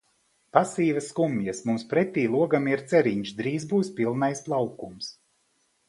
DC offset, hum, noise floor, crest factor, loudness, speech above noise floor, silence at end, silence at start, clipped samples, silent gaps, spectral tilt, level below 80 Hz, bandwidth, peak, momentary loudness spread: under 0.1%; none; -70 dBFS; 24 dB; -26 LUFS; 45 dB; 0.75 s; 0.55 s; under 0.1%; none; -6 dB/octave; -68 dBFS; 11.5 kHz; -2 dBFS; 8 LU